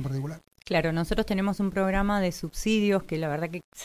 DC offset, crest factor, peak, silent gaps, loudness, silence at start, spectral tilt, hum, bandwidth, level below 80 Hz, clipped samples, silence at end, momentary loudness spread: under 0.1%; 16 dB; -12 dBFS; 3.64-3.72 s; -27 LUFS; 0 s; -6 dB/octave; none; 15.5 kHz; -42 dBFS; under 0.1%; 0 s; 8 LU